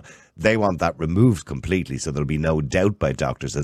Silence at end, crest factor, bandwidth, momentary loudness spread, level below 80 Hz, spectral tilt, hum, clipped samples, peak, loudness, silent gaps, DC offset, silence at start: 0 s; 18 dB; 13 kHz; 7 LU; -38 dBFS; -6.5 dB/octave; none; under 0.1%; -4 dBFS; -22 LUFS; none; under 0.1%; 0.05 s